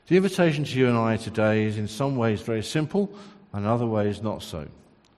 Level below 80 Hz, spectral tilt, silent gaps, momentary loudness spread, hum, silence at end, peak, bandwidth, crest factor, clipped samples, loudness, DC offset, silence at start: -58 dBFS; -6.5 dB/octave; none; 11 LU; none; 0.5 s; -8 dBFS; 13 kHz; 18 dB; under 0.1%; -25 LUFS; under 0.1%; 0.1 s